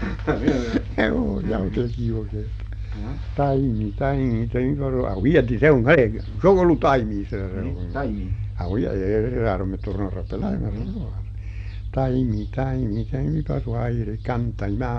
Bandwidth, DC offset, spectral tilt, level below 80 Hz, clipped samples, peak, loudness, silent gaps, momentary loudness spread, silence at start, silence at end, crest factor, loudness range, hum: 7 kHz; under 0.1%; -9 dB/octave; -32 dBFS; under 0.1%; -4 dBFS; -23 LUFS; none; 13 LU; 0 s; 0 s; 18 dB; 7 LU; none